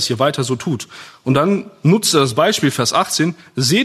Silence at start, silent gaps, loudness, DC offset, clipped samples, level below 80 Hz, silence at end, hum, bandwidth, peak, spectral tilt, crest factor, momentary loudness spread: 0 s; none; -16 LUFS; under 0.1%; under 0.1%; -58 dBFS; 0 s; none; 13.5 kHz; 0 dBFS; -4.5 dB/octave; 16 dB; 9 LU